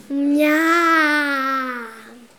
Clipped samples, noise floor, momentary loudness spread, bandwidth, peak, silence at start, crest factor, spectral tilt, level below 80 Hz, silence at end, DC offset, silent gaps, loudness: under 0.1%; -41 dBFS; 14 LU; 17.5 kHz; -6 dBFS; 0.1 s; 14 dB; -2 dB/octave; -74 dBFS; 0.2 s; 0.1%; none; -17 LUFS